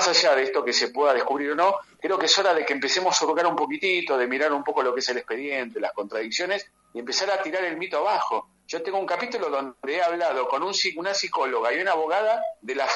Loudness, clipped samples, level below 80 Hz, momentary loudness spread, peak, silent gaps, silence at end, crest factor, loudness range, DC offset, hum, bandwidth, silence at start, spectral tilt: -24 LUFS; under 0.1%; -74 dBFS; 8 LU; -4 dBFS; none; 0 s; 20 dB; 5 LU; under 0.1%; none; 11.5 kHz; 0 s; -1 dB/octave